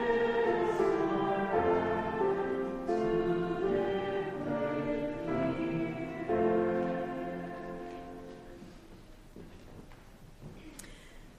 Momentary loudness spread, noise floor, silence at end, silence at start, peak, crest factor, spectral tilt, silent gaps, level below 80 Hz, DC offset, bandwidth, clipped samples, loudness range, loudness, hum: 22 LU; -53 dBFS; 0 s; 0 s; -18 dBFS; 16 dB; -7 dB/octave; none; -54 dBFS; under 0.1%; 12.5 kHz; under 0.1%; 17 LU; -32 LUFS; none